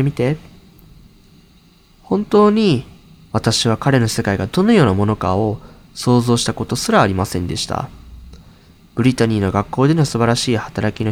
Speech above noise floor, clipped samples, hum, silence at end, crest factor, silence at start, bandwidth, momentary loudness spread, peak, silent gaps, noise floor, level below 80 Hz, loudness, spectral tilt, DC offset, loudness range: 34 dB; under 0.1%; none; 0 s; 18 dB; 0 s; 16.5 kHz; 10 LU; 0 dBFS; none; -49 dBFS; -42 dBFS; -17 LUFS; -5.5 dB/octave; under 0.1%; 3 LU